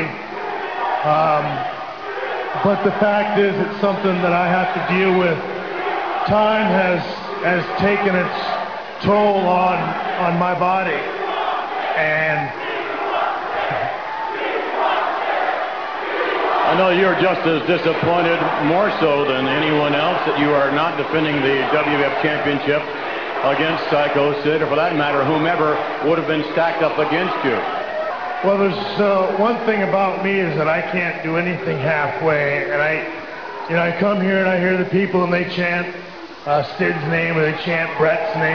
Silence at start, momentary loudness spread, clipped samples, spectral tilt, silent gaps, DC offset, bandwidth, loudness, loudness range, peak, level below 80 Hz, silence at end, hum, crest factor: 0 s; 7 LU; under 0.1%; -7 dB/octave; none; 0.4%; 5.4 kHz; -18 LUFS; 3 LU; -4 dBFS; -56 dBFS; 0 s; none; 14 dB